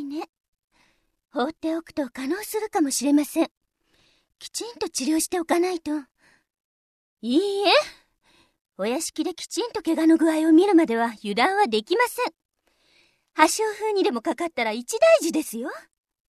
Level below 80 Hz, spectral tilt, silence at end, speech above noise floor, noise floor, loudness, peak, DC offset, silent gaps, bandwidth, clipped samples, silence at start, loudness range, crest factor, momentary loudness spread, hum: -68 dBFS; -2.5 dB/octave; 0.5 s; 43 dB; -65 dBFS; -23 LUFS; -2 dBFS; under 0.1%; 0.29-0.53 s, 0.64-0.68 s, 3.51-3.61 s, 6.60-7.17 s, 8.61-8.65 s, 12.45-12.49 s; 14 kHz; under 0.1%; 0 s; 6 LU; 22 dB; 14 LU; none